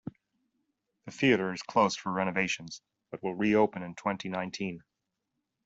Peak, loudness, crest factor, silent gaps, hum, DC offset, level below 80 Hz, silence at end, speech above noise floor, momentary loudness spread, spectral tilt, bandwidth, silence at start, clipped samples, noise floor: -12 dBFS; -30 LUFS; 20 dB; none; none; under 0.1%; -68 dBFS; 0.85 s; 54 dB; 20 LU; -5 dB/octave; 8 kHz; 0.05 s; under 0.1%; -84 dBFS